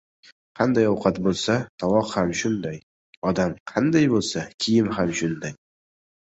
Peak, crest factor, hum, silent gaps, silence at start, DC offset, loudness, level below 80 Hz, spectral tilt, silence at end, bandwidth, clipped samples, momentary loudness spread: -4 dBFS; 18 dB; none; 1.69-1.78 s, 2.83-3.22 s, 3.60-3.66 s, 4.54-4.58 s; 0.55 s; under 0.1%; -23 LUFS; -52 dBFS; -5.5 dB/octave; 0.75 s; 8.2 kHz; under 0.1%; 9 LU